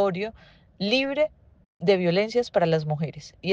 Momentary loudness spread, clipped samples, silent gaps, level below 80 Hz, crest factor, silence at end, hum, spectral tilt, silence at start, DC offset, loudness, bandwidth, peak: 11 LU; under 0.1%; 1.66-1.80 s; -60 dBFS; 18 dB; 0 s; none; -6.5 dB/octave; 0 s; under 0.1%; -25 LUFS; 8 kHz; -8 dBFS